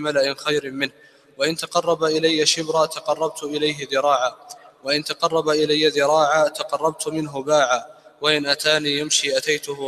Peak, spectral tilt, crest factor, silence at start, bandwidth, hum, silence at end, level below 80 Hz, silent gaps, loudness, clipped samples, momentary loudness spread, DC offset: -2 dBFS; -2.5 dB/octave; 20 dB; 0 s; 14.5 kHz; none; 0 s; -66 dBFS; none; -20 LUFS; under 0.1%; 7 LU; under 0.1%